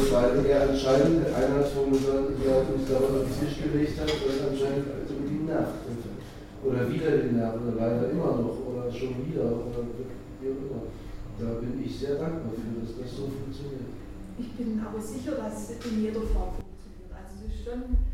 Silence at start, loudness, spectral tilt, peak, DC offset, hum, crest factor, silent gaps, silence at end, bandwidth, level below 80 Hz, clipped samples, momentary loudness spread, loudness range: 0 s; -28 LUFS; -7 dB/octave; -8 dBFS; under 0.1%; none; 18 dB; none; 0 s; 16 kHz; -38 dBFS; under 0.1%; 16 LU; 9 LU